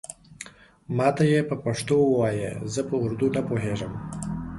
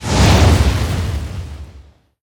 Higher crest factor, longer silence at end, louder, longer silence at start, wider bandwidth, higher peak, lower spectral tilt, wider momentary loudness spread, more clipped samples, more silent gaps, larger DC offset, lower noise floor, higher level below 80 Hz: about the same, 18 dB vs 14 dB; second, 0 s vs 0.45 s; second, -25 LUFS vs -14 LUFS; about the same, 0.1 s vs 0 s; second, 11.5 kHz vs 19 kHz; second, -8 dBFS vs 0 dBFS; about the same, -6.5 dB/octave vs -5.5 dB/octave; about the same, 20 LU vs 20 LU; neither; neither; neither; about the same, -46 dBFS vs -43 dBFS; second, -50 dBFS vs -20 dBFS